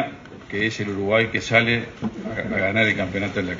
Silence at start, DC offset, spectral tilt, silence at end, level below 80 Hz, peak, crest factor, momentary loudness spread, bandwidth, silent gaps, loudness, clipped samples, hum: 0 s; under 0.1%; -5.5 dB/octave; 0 s; -50 dBFS; -2 dBFS; 20 dB; 12 LU; 7.6 kHz; none; -22 LUFS; under 0.1%; none